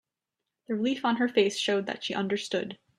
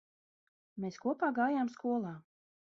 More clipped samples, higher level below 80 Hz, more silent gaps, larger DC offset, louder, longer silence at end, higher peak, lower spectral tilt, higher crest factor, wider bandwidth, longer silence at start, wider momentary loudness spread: neither; first, -74 dBFS vs -82 dBFS; neither; neither; first, -28 LUFS vs -35 LUFS; second, 0.25 s vs 0.6 s; first, -10 dBFS vs -20 dBFS; second, -4 dB/octave vs -6 dB/octave; about the same, 20 dB vs 18 dB; first, 13 kHz vs 7.2 kHz; about the same, 0.7 s vs 0.75 s; second, 7 LU vs 15 LU